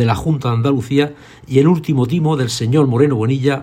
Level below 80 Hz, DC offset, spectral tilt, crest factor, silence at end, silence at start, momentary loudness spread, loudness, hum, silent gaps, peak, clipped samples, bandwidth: -46 dBFS; under 0.1%; -7 dB/octave; 14 dB; 0 s; 0 s; 4 LU; -16 LUFS; none; none; 0 dBFS; under 0.1%; 15 kHz